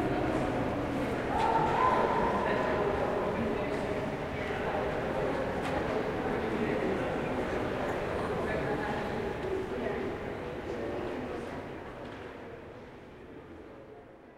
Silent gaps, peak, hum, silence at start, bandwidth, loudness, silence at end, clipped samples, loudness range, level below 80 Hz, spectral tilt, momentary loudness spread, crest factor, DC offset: none; -14 dBFS; none; 0 s; 16 kHz; -32 LUFS; 0 s; under 0.1%; 10 LU; -48 dBFS; -6.5 dB/octave; 18 LU; 18 dB; under 0.1%